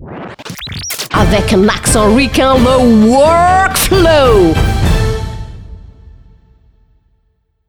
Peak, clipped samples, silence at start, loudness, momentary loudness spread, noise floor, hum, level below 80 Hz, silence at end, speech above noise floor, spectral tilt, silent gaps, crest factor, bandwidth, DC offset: 0 dBFS; under 0.1%; 0 s; -9 LUFS; 17 LU; -59 dBFS; none; -22 dBFS; 1.8 s; 51 dB; -5 dB/octave; none; 12 dB; over 20 kHz; under 0.1%